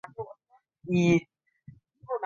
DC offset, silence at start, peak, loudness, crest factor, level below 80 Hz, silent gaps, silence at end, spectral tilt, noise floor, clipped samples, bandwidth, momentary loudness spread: under 0.1%; 0.2 s; -12 dBFS; -26 LUFS; 20 dB; -62 dBFS; none; 0 s; -7 dB/octave; -67 dBFS; under 0.1%; 7.4 kHz; 20 LU